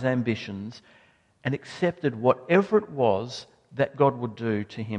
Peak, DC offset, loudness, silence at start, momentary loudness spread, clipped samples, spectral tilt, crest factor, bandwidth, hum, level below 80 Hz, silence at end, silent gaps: -6 dBFS; under 0.1%; -26 LUFS; 0 s; 15 LU; under 0.1%; -7 dB/octave; 20 dB; 9.6 kHz; none; -62 dBFS; 0 s; none